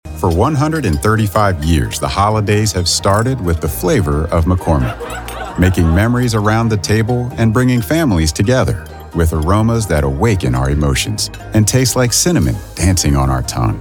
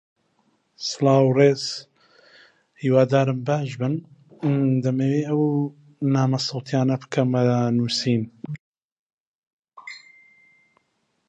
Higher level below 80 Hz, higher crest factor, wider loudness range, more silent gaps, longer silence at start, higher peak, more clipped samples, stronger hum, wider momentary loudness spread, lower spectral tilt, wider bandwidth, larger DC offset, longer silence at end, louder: first, -24 dBFS vs -68 dBFS; second, 12 dB vs 18 dB; second, 1 LU vs 5 LU; second, none vs 8.60-8.74 s, 8.84-9.63 s; second, 0.05 s vs 0.8 s; about the same, -2 dBFS vs -4 dBFS; neither; neither; second, 5 LU vs 17 LU; second, -5 dB/octave vs -6.5 dB/octave; first, 18.5 kHz vs 9 kHz; neither; second, 0 s vs 1.3 s; first, -14 LUFS vs -22 LUFS